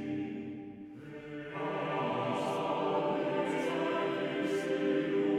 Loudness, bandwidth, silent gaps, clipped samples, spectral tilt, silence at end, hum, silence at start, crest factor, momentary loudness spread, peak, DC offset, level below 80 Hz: -34 LUFS; 12.5 kHz; none; under 0.1%; -6 dB/octave; 0 s; none; 0 s; 14 dB; 13 LU; -20 dBFS; under 0.1%; -72 dBFS